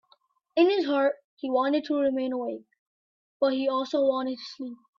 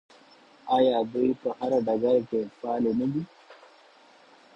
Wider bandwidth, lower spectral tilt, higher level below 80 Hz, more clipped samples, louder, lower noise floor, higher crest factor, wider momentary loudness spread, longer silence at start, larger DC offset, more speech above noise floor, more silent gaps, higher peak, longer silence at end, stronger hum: about the same, 7.2 kHz vs 7.2 kHz; second, -4.5 dB/octave vs -8 dB/octave; second, -76 dBFS vs -66 dBFS; neither; about the same, -27 LUFS vs -26 LUFS; first, -66 dBFS vs -56 dBFS; about the same, 18 dB vs 18 dB; first, 13 LU vs 9 LU; about the same, 0.55 s vs 0.65 s; neither; first, 40 dB vs 30 dB; first, 1.24-1.37 s, 2.79-3.40 s vs none; about the same, -10 dBFS vs -10 dBFS; second, 0.25 s vs 1 s; neither